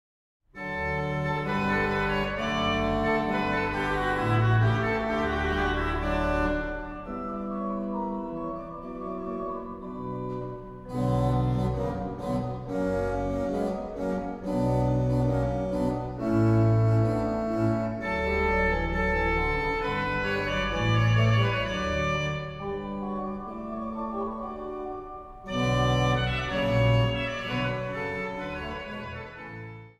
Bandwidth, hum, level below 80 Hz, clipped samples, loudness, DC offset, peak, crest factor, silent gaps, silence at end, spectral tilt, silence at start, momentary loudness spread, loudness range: 11.5 kHz; none; -40 dBFS; under 0.1%; -28 LUFS; under 0.1%; -12 dBFS; 16 dB; none; 0.1 s; -7 dB/octave; 0.55 s; 12 LU; 7 LU